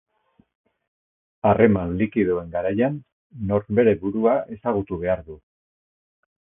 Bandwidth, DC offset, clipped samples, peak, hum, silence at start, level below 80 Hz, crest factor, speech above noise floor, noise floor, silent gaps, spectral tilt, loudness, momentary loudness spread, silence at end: 3.7 kHz; under 0.1%; under 0.1%; -2 dBFS; none; 1.45 s; -48 dBFS; 22 dB; over 69 dB; under -90 dBFS; 3.12-3.30 s; -12.5 dB/octave; -22 LUFS; 8 LU; 1.1 s